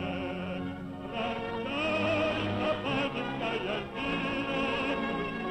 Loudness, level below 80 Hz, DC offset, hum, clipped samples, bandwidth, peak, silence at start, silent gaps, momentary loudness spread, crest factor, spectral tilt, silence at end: -32 LUFS; -54 dBFS; under 0.1%; none; under 0.1%; 10.5 kHz; -20 dBFS; 0 s; none; 7 LU; 12 dB; -6 dB/octave; 0 s